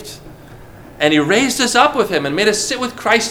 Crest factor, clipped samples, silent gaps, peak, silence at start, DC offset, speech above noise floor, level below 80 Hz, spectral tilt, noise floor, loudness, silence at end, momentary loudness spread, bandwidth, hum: 16 dB; under 0.1%; none; 0 dBFS; 0 s; under 0.1%; 23 dB; -46 dBFS; -3 dB/octave; -38 dBFS; -15 LUFS; 0 s; 7 LU; 19.5 kHz; none